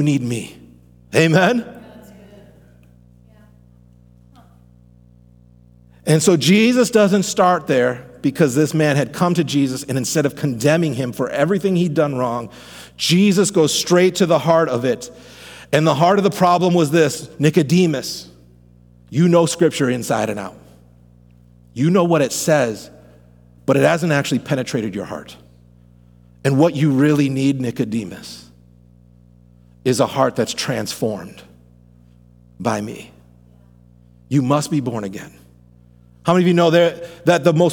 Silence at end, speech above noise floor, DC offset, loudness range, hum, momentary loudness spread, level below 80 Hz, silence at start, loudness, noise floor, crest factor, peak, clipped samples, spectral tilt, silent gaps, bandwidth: 0 s; 32 dB; under 0.1%; 7 LU; 60 Hz at -45 dBFS; 14 LU; -54 dBFS; 0 s; -17 LUFS; -48 dBFS; 18 dB; -2 dBFS; under 0.1%; -5.5 dB/octave; none; 18.5 kHz